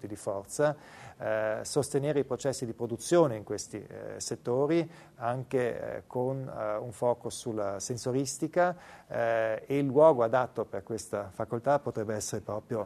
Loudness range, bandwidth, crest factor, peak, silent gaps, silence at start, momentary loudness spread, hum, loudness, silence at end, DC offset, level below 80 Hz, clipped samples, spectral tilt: 5 LU; 13.5 kHz; 20 dB; -10 dBFS; none; 0 s; 11 LU; none; -31 LUFS; 0 s; under 0.1%; -66 dBFS; under 0.1%; -5.5 dB/octave